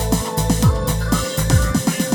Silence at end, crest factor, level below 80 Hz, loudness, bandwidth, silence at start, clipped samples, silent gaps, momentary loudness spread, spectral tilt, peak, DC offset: 0 s; 18 dB; -24 dBFS; -18 LUFS; over 20 kHz; 0 s; under 0.1%; none; 3 LU; -5 dB/octave; 0 dBFS; under 0.1%